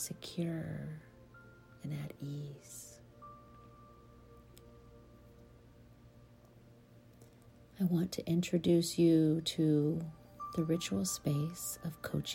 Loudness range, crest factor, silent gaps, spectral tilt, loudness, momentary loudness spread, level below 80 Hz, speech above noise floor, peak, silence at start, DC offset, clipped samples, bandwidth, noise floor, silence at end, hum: 18 LU; 18 dB; none; -6 dB/octave; -35 LUFS; 20 LU; -64 dBFS; 26 dB; -18 dBFS; 0 s; under 0.1%; under 0.1%; 16.5 kHz; -60 dBFS; 0 s; none